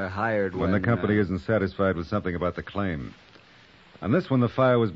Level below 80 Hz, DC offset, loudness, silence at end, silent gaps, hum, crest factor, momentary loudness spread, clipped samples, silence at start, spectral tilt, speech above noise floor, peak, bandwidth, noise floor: -50 dBFS; under 0.1%; -26 LUFS; 0 s; none; none; 16 dB; 9 LU; under 0.1%; 0 s; -9 dB/octave; 29 dB; -10 dBFS; 7.2 kHz; -54 dBFS